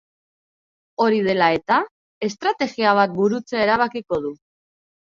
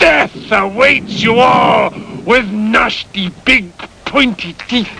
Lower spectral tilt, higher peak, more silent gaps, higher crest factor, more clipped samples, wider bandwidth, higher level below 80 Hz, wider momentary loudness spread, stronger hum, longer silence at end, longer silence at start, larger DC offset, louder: about the same, -5.5 dB/octave vs -4.5 dB/octave; second, -4 dBFS vs 0 dBFS; first, 1.91-2.21 s vs none; first, 18 dB vs 12 dB; neither; second, 7.4 kHz vs 10.5 kHz; second, -60 dBFS vs -38 dBFS; about the same, 11 LU vs 10 LU; neither; first, 0.7 s vs 0 s; first, 1 s vs 0 s; neither; second, -20 LUFS vs -12 LUFS